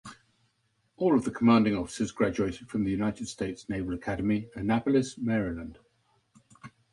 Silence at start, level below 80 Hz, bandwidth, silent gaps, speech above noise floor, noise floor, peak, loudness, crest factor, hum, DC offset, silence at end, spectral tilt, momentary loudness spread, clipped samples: 0.05 s; -54 dBFS; 11.5 kHz; none; 45 dB; -73 dBFS; -12 dBFS; -28 LUFS; 18 dB; none; under 0.1%; 0.25 s; -6.5 dB/octave; 11 LU; under 0.1%